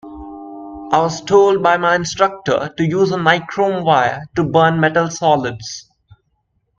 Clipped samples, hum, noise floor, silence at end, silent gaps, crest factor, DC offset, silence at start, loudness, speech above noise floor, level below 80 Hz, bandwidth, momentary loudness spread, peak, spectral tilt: under 0.1%; none; -66 dBFS; 1 s; none; 16 dB; under 0.1%; 0.05 s; -15 LUFS; 51 dB; -50 dBFS; 7.6 kHz; 19 LU; 0 dBFS; -5 dB/octave